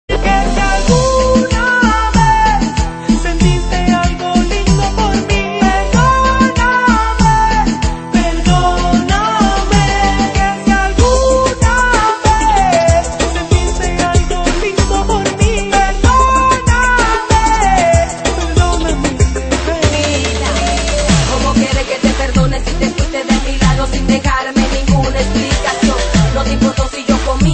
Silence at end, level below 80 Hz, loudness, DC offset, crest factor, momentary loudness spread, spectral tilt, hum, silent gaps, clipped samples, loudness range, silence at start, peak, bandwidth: 0 s; -18 dBFS; -12 LUFS; under 0.1%; 12 dB; 5 LU; -5 dB/octave; none; none; under 0.1%; 2 LU; 0.1 s; 0 dBFS; 8.8 kHz